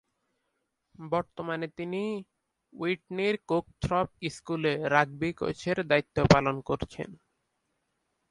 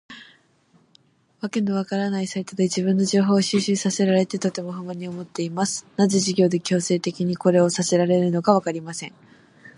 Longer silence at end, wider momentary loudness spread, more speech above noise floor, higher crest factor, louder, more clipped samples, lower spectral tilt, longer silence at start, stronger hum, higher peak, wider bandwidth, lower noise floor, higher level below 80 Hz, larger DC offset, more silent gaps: first, 1.15 s vs 0.05 s; about the same, 12 LU vs 13 LU; first, 51 dB vs 38 dB; first, 26 dB vs 20 dB; second, -29 LUFS vs -22 LUFS; neither; about the same, -6 dB/octave vs -5 dB/octave; first, 1 s vs 0.1 s; neither; about the same, -4 dBFS vs -2 dBFS; about the same, 11.5 kHz vs 11.5 kHz; first, -80 dBFS vs -60 dBFS; first, -52 dBFS vs -68 dBFS; neither; neither